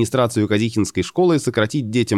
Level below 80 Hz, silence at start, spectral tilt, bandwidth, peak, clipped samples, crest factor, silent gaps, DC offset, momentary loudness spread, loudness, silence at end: -52 dBFS; 0 s; -5.5 dB/octave; 14 kHz; -4 dBFS; under 0.1%; 14 dB; none; 0.1%; 4 LU; -19 LUFS; 0 s